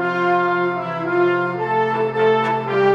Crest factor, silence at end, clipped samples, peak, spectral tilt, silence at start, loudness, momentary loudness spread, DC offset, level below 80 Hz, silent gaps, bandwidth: 14 dB; 0 s; under 0.1%; -4 dBFS; -7.5 dB/octave; 0 s; -19 LUFS; 4 LU; under 0.1%; -62 dBFS; none; 7.2 kHz